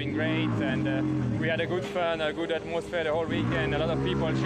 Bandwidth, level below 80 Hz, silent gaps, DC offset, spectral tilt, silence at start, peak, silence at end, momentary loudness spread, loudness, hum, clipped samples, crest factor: 10 kHz; -48 dBFS; none; under 0.1%; -7 dB/octave; 0 s; -14 dBFS; 0 s; 2 LU; -28 LUFS; none; under 0.1%; 12 dB